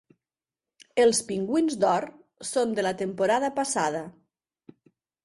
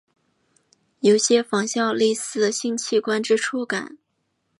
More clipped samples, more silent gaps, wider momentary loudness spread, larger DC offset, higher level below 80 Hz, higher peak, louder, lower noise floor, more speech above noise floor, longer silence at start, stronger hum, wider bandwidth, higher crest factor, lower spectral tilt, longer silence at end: neither; neither; first, 12 LU vs 8 LU; neither; first, -68 dBFS vs -76 dBFS; second, -10 dBFS vs -4 dBFS; second, -26 LUFS vs -21 LUFS; first, under -90 dBFS vs -73 dBFS; first, over 65 dB vs 52 dB; about the same, 0.95 s vs 1.05 s; neither; about the same, 11.5 kHz vs 11.5 kHz; about the same, 18 dB vs 18 dB; about the same, -3.5 dB/octave vs -3 dB/octave; first, 1.15 s vs 0.65 s